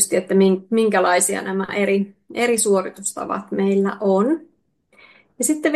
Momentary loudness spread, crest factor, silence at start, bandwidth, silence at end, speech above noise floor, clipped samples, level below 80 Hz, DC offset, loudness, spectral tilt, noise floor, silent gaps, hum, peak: 9 LU; 20 dB; 0 s; 12.5 kHz; 0 s; 42 dB; under 0.1%; -66 dBFS; under 0.1%; -19 LUFS; -4.5 dB/octave; -61 dBFS; none; none; 0 dBFS